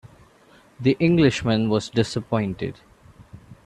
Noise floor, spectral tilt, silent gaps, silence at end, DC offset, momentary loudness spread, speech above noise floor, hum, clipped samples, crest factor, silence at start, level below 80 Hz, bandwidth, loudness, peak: -54 dBFS; -6.5 dB/octave; none; 0.1 s; under 0.1%; 10 LU; 33 dB; none; under 0.1%; 18 dB; 0.8 s; -50 dBFS; 11 kHz; -22 LUFS; -6 dBFS